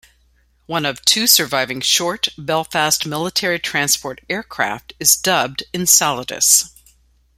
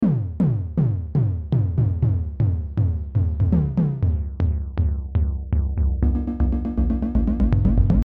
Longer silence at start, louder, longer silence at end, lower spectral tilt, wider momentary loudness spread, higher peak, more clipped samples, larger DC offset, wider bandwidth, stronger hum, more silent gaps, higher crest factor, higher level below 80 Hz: first, 0.7 s vs 0 s; first, -16 LUFS vs -22 LUFS; first, 0.7 s vs 0 s; second, -1 dB/octave vs -12 dB/octave; first, 10 LU vs 4 LU; first, 0 dBFS vs -4 dBFS; neither; neither; first, 16.5 kHz vs 3.7 kHz; neither; neither; about the same, 18 dB vs 16 dB; second, -54 dBFS vs -24 dBFS